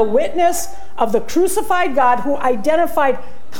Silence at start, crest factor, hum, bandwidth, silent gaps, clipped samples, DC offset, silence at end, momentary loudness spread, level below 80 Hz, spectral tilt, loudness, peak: 0 s; 14 dB; none; 17.5 kHz; none; under 0.1%; 10%; 0 s; 7 LU; -46 dBFS; -4 dB/octave; -17 LUFS; -2 dBFS